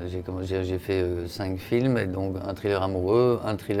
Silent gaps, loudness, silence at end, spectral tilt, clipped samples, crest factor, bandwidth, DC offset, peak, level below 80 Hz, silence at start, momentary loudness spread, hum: none; -26 LUFS; 0 s; -7.5 dB/octave; under 0.1%; 14 dB; 16 kHz; under 0.1%; -10 dBFS; -54 dBFS; 0 s; 9 LU; none